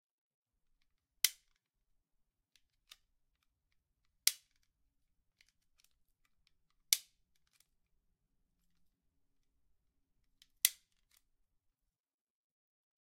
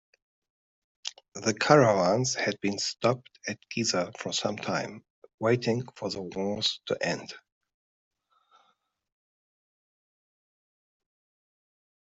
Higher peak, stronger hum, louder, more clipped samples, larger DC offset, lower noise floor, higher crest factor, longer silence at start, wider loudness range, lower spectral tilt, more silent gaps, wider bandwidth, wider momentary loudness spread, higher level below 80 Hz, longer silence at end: about the same, -4 dBFS vs -4 dBFS; neither; second, -35 LUFS vs -28 LUFS; neither; neither; first, -85 dBFS vs -72 dBFS; first, 42 dB vs 28 dB; first, 1.25 s vs 1.05 s; second, 1 LU vs 8 LU; second, 5 dB/octave vs -4 dB/octave; second, none vs 5.10-5.22 s, 5.34-5.38 s; first, 15.5 kHz vs 8.2 kHz; second, 1 LU vs 16 LU; second, -82 dBFS vs -70 dBFS; second, 2.3 s vs 4.8 s